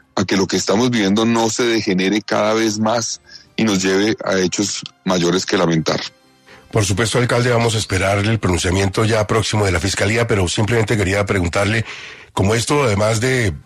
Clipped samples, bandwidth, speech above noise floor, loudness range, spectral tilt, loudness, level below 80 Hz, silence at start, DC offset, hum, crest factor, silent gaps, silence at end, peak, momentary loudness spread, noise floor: under 0.1%; 13.5 kHz; 29 dB; 2 LU; -4.5 dB/octave; -17 LUFS; -42 dBFS; 0.15 s; under 0.1%; none; 14 dB; none; 0.05 s; -2 dBFS; 5 LU; -46 dBFS